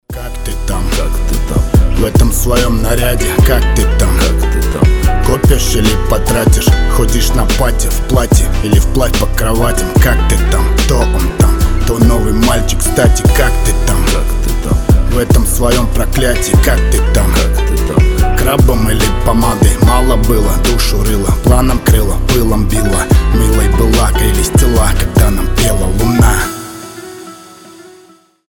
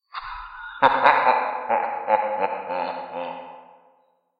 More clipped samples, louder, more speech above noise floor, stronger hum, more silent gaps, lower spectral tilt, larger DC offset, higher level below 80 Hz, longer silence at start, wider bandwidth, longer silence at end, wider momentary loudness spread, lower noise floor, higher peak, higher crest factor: neither; first, -12 LUFS vs -22 LUFS; second, 35 dB vs 44 dB; neither; neither; about the same, -5 dB/octave vs -5.5 dB/octave; neither; first, -12 dBFS vs -58 dBFS; about the same, 0.1 s vs 0.15 s; first, 19.5 kHz vs 5.2 kHz; about the same, 0.65 s vs 0.75 s; second, 5 LU vs 19 LU; second, -44 dBFS vs -63 dBFS; about the same, 0 dBFS vs -2 dBFS; second, 10 dB vs 22 dB